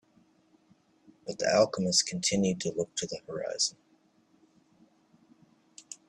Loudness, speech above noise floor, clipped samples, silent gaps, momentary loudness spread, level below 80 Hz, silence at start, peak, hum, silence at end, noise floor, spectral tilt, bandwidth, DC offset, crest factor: -29 LUFS; 37 dB; under 0.1%; none; 13 LU; -70 dBFS; 1.25 s; -10 dBFS; none; 0.15 s; -67 dBFS; -3 dB/octave; 12.5 kHz; under 0.1%; 22 dB